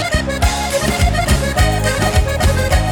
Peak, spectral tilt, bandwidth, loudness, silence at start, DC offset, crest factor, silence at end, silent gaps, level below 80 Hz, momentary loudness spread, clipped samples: -4 dBFS; -4.5 dB/octave; over 20 kHz; -15 LUFS; 0 s; under 0.1%; 10 dB; 0 s; none; -18 dBFS; 2 LU; under 0.1%